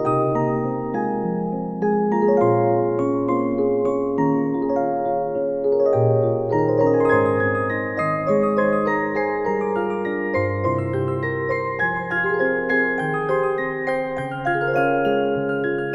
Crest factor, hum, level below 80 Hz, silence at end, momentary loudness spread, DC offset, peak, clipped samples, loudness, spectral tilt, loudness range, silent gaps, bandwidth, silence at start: 16 dB; none; -52 dBFS; 0 s; 6 LU; under 0.1%; -6 dBFS; under 0.1%; -21 LUFS; -9 dB/octave; 3 LU; none; 8.4 kHz; 0 s